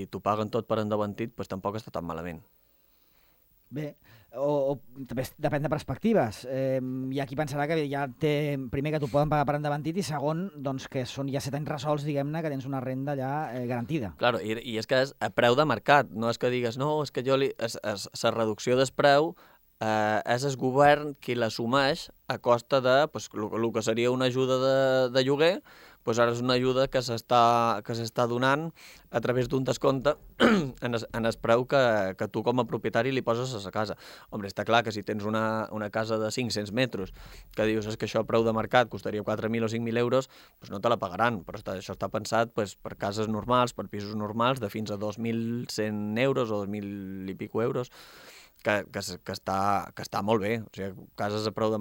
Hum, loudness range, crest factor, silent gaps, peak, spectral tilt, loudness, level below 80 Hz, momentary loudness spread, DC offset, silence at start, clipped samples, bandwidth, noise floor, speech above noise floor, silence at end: none; 6 LU; 22 dB; none; -6 dBFS; -5.5 dB/octave; -28 LUFS; -58 dBFS; 12 LU; under 0.1%; 0 s; under 0.1%; 17 kHz; -64 dBFS; 36 dB; 0 s